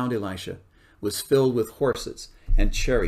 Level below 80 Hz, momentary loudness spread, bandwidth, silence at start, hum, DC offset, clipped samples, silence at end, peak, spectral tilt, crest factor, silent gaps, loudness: -28 dBFS; 16 LU; 15.5 kHz; 0 s; none; under 0.1%; under 0.1%; 0 s; -8 dBFS; -5 dB/octave; 16 dB; none; -26 LUFS